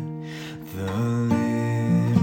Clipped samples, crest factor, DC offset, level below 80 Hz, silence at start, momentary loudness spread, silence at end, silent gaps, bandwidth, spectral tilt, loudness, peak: under 0.1%; 18 dB; under 0.1%; -56 dBFS; 0 s; 13 LU; 0 s; none; 16.5 kHz; -8 dB/octave; -25 LUFS; -6 dBFS